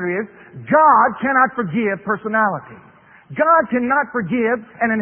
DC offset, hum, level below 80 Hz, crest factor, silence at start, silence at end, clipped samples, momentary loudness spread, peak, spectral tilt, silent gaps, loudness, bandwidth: under 0.1%; none; -60 dBFS; 16 dB; 0 s; 0 s; under 0.1%; 13 LU; -2 dBFS; -11.5 dB/octave; none; -17 LUFS; 3.4 kHz